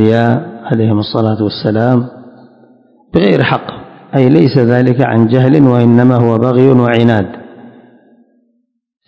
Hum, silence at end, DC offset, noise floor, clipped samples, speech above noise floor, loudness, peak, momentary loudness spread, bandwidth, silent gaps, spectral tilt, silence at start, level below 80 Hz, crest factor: none; 1.4 s; under 0.1%; -62 dBFS; 2%; 53 dB; -10 LUFS; 0 dBFS; 10 LU; 5.6 kHz; none; -9.5 dB/octave; 0 s; -46 dBFS; 12 dB